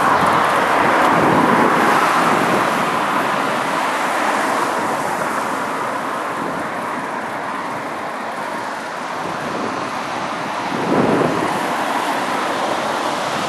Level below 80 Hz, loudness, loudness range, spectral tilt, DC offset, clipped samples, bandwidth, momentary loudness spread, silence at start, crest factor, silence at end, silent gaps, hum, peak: -56 dBFS; -18 LUFS; 9 LU; -4 dB/octave; under 0.1%; under 0.1%; 13.5 kHz; 10 LU; 0 s; 18 dB; 0 s; none; none; -2 dBFS